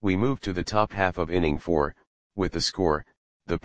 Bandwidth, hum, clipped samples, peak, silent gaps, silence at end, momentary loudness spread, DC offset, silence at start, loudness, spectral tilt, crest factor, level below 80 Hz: 9.6 kHz; none; under 0.1%; -4 dBFS; 2.07-2.30 s, 3.17-3.40 s; 0 s; 6 LU; 0.6%; 0 s; -26 LUFS; -5.5 dB/octave; 22 dB; -42 dBFS